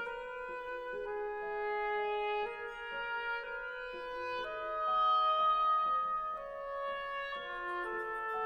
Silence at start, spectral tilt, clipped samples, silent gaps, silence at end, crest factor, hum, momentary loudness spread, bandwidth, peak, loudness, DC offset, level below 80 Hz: 0 s; -3.5 dB/octave; under 0.1%; none; 0 s; 14 dB; none; 12 LU; 9.4 kHz; -22 dBFS; -35 LUFS; under 0.1%; -64 dBFS